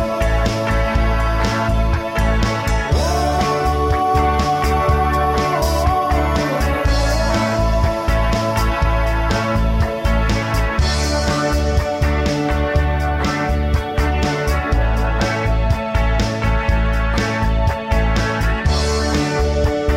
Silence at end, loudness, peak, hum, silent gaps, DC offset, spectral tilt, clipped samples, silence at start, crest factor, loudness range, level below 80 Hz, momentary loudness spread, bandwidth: 0 s; -18 LUFS; -4 dBFS; none; none; under 0.1%; -5.5 dB/octave; under 0.1%; 0 s; 12 dB; 2 LU; -20 dBFS; 2 LU; 15.5 kHz